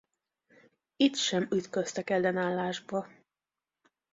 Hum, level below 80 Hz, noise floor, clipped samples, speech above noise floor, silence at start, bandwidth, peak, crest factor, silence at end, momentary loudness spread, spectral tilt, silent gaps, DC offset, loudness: none; -74 dBFS; under -90 dBFS; under 0.1%; over 60 dB; 1 s; 7.8 kHz; -10 dBFS; 22 dB; 1.1 s; 9 LU; -4 dB/octave; none; under 0.1%; -30 LUFS